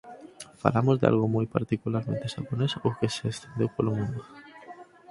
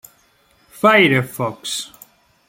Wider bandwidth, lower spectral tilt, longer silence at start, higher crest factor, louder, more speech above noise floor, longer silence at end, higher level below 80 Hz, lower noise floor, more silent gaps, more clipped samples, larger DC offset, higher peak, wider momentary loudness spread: second, 11.5 kHz vs 16.5 kHz; first, -7 dB/octave vs -4.5 dB/octave; second, 0.05 s vs 0.75 s; first, 26 dB vs 18 dB; second, -28 LUFS vs -16 LUFS; second, 21 dB vs 41 dB; second, 0.25 s vs 0.6 s; about the same, -58 dBFS vs -60 dBFS; second, -48 dBFS vs -57 dBFS; neither; neither; neither; about the same, -2 dBFS vs -2 dBFS; first, 23 LU vs 14 LU